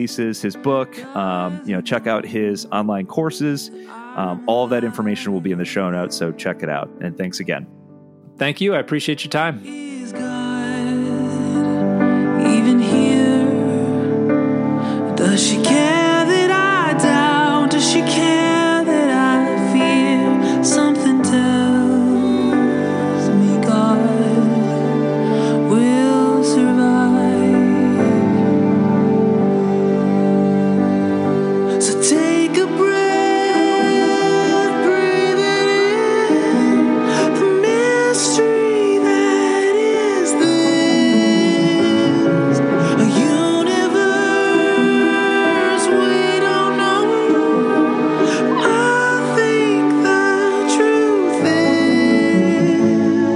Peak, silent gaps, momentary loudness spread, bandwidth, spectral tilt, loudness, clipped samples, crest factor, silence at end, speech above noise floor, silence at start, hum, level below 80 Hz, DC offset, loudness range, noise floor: -2 dBFS; none; 8 LU; 12 kHz; -5 dB/octave; -16 LUFS; under 0.1%; 14 dB; 0 s; 22 dB; 0 s; none; -64 dBFS; under 0.1%; 7 LU; -43 dBFS